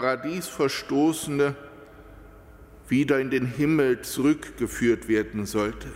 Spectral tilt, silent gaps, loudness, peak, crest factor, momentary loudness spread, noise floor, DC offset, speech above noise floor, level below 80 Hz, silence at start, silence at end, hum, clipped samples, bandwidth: -5.5 dB/octave; none; -25 LUFS; -10 dBFS; 16 dB; 6 LU; -48 dBFS; under 0.1%; 23 dB; -50 dBFS; 0 s; 0 s; none; under 0.1%; 16 kHz